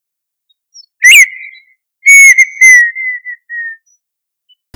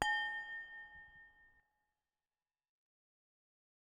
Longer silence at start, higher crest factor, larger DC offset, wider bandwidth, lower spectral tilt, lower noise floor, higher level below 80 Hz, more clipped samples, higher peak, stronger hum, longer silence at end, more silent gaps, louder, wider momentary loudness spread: first, 1 s vs 0 s; second, 10 dB vs 30 dB; neither; first, over 20 kHz vs 13 kHz; second, 6.5 dB/octave vs -1.5 dB/octave; second, -77 dBFS vs under -90 dBFS; first, -64 dBFS vs -74 dBFS; first, 8% vs under 0.1%; first, 0 dBFS vs -16 dBFS; neither; second, 1 s vs 2.4 s; neither; first, -3 LUFS vs -41 LUFS; second, 21 LU vs 24 LU